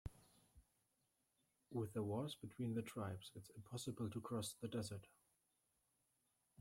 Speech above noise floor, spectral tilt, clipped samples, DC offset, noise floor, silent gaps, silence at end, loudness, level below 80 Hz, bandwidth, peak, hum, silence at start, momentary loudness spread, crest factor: 38 dB; -6 dB/octave; under 0.1%; under 0.1%; -86 dBFS; none; 1.55 s; -48 LUFS; -74 dBFS; 16 kHz; -32 dBFS; none; 0.05 s; 10 LU; 18 dB